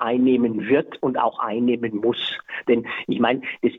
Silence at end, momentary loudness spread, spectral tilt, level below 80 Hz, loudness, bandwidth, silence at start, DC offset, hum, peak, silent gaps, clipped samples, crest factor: 0 s; 7 LU; -7.5 dB/octave; -64 dBFS; -22 LUFS; 4.1 kHz; 0 s; under 0.1%; none; -6 dBFS; none; under 0.1%; 16 dB